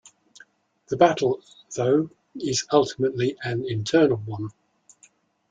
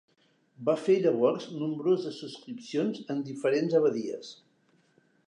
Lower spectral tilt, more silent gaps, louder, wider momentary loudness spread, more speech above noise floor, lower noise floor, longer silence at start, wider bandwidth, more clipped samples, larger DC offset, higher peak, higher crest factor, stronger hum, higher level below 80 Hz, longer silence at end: second, -5 dB/octave vs -6.5 dB/octave; neither; first, -24 LUFS vs -29 LUFS; second, 13 LU vs 16 LU; about the same, 37 dB vs 39 dB; second, -59 dBFS vs -68 dBFS; first, 0.9 s vs 0.6 s; second, 9.4 kHz vs 10.5 kHz; neither; neither; first, -2 dBFS vs -12 dBFS; first, 22 dB vs 16 dB; neither; first, -62 dBFS vs -86 dBFS; about the same, 1 s vs 0.95 s